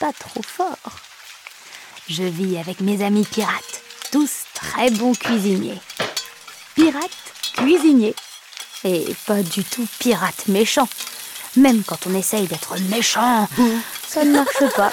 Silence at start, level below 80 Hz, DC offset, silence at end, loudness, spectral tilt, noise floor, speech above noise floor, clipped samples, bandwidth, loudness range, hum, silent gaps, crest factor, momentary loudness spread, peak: 0 s; -60 dBFS; under 0.1%; 0 s; -19 LUFS; -4 dB/octave; -41 dBFS; 22 dB; under 0.1%; 17.5 kHz; 5 LU; none; none; 16 dB; 18 LU; -4 dBFS